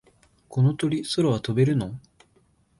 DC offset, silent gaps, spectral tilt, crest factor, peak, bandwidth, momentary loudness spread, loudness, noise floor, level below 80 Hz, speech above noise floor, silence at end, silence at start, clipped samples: under 0.1%; none; -7 dB/octave; 16 dB; -10 dBFS; 11.5 kHz; 11 LU; -24 LUFS; -63 dBFS; -56 dBFS; 40 dB; 0.8 s; 0.5 s; under 0.1%